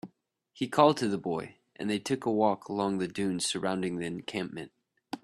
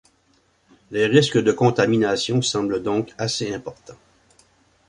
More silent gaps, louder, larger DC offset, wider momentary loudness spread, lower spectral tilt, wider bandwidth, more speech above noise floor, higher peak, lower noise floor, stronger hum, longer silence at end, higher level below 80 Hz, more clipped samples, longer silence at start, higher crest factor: neither; second, -30 LUFS vs -20 LUFS; neither; first, 17 LU vs 12 LU; about the same, -5 dB/octave vs -5 dB/octave; first, 13 kHz vs 11 kHz; about the same, 39 dB vs 42 dB; second, -8 dBFS vs -2 dBFS; first, -68 dBFS vs -62 dBFS; neither; second, 0.05 s vs 0.95 s; second, -70 dBFS vs -58 dBFS; neither; second, 0.05 s vs 0.9 s; about the same, 22 dB vs 20 dB